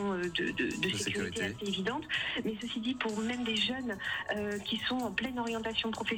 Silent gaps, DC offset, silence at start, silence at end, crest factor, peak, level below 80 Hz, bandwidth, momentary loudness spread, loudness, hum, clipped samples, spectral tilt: none; under 0.1%; 0 s; 0 s; 16 dB; -18 dBFS; -60 dBFS; over 20 kHz; 4 LU; -33 LUFS; none; under 0.1%; -3.5 dB/octave